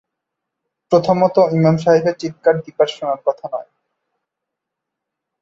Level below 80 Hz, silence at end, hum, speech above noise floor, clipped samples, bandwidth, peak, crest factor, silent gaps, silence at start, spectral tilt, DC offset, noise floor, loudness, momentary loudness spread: -58 dBFS; 1.8 s; none; 66 dB; under 0.1%; 7.6 kHz; -2 dBFS; 18 dB; none; 0.9 s; -7 dB/octave; under 0.1%; -81 dBFS; -16 LUFS; 9 LU